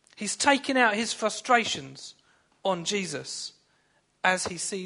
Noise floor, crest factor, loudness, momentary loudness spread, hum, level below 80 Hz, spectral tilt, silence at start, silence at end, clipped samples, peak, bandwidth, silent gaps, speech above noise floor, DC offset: -68 dBFS; 22 dB; -26 LUFS; 14 LU; none; -68 dBFS; -2.5 dB/octave; 0.2 s; 0 s; under 0.1%; -6 dBFS; 11 kHz; none; 41 dB; under 0.1%